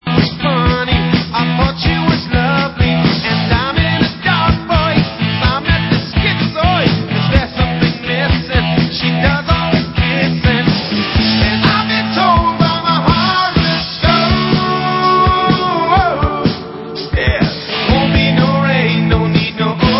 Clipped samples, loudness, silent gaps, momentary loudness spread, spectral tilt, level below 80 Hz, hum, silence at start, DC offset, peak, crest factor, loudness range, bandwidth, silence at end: under 0.1%; -13 LUFS; none; 4 LU; -9 dB/octave; -24 dBFS; none; 0.05 s; under 0.1%; 0 dBFS; 12 dB; 2 LU; 5.8 kHz; 0 s